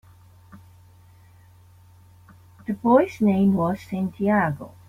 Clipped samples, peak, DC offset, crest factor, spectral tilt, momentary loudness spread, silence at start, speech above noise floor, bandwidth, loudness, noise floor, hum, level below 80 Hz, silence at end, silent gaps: under 0.1%; -6 dBFS; under 0.1%; 18 dB; -9 dB/octave; 10 LU; 0.55 s; 30 dB; 14 kHz; -22 LUFS; -51 dBFS; none; -58 dBFS; 0.2 s; none